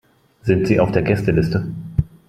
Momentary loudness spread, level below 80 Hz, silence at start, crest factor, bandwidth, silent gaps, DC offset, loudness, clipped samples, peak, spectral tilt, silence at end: 8 LU; -38 dBFS; 0.45 s; 16 dB; 13.5 kHz; none; under 0.1%; -19 LUFS; under 0.1%; -2 dBFS; -8.5 dB/octave; 0.2 s